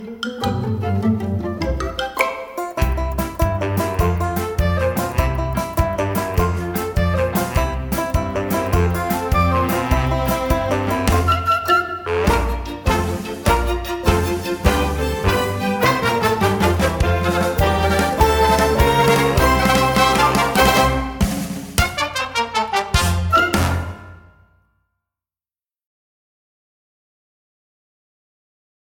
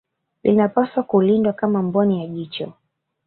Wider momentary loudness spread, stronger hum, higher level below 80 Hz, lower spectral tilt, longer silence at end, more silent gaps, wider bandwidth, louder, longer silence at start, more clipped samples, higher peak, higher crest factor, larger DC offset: second, 8 LU vs 12 LU; neither; first, -28 dBFS vs -60 dBFS; second, -5 dB/octave vs -12.5 dB/octave; first, 4.75 s vs 0.55 s; neither; first, 19 kHz vs 4.4 kHz; about the same, -19 LUFS vs -19 LUFS; second, 0 s vs 0.45 s; neither; about the same, 0 dBFS vs -2 dBFS; about the same, 18 dB vs 16 dB; neither